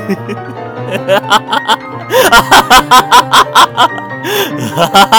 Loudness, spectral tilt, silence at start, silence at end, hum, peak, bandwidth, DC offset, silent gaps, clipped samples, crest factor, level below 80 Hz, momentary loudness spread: -8 LUFS; -2.5 dB/octave; 0 s; 0 s; none; 0 dBFS; over 20 kHz; under 0.1%; none; 4%; 8 dB; -36 dBFS; 14 LU